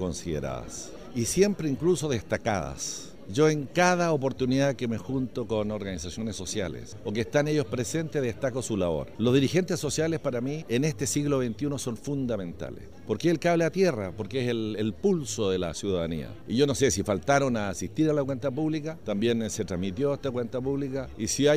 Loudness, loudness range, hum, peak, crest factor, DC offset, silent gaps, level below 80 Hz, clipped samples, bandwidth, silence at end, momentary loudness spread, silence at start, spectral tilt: -28 LUFS; 3 LU; none; -10 dBFS; 18 dB; 0.5%; none; -52 dBFS; under 0.1%; 15.5 kHz; 0 s; 9 LU; 0 s; -5 dB/octave